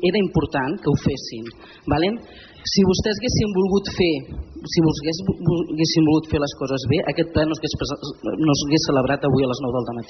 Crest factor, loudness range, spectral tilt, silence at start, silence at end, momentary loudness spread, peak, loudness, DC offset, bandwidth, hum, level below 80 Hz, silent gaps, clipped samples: 14 dB; 1 LU; -5.5 dB/octave; 0 s; 0.05 s; 10 LU; -6 dBFS; -21 LUFS; under 0.1%; 6.4 kHz; none; -40 dBFS; none; under 0.1%